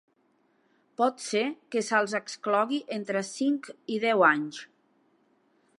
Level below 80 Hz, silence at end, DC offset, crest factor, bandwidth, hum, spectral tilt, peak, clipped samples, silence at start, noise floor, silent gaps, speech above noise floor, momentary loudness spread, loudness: -86 dBFS; 1.15 s; under 0.1%; 22 dB; 11.5 kHz; none; -3.5 dB/octave; -8 dBFS; under 0.1%; 1 s; -69 dBFS; none; 42 dB; 11 LU; -27 LUFS